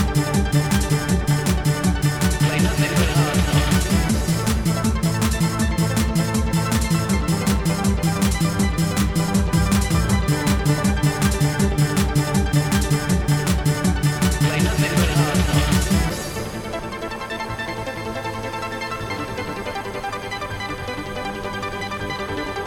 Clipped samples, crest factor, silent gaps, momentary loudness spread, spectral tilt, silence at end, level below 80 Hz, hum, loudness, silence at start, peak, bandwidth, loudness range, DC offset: under 0.1%; 16 dB; none; 9 LU; -5 dB/octave; 0 s; -28 dBFS; none; -21 LUFS; 0 s; -4 dBFS; 19.5 kHz; 8 LU; under 0.1%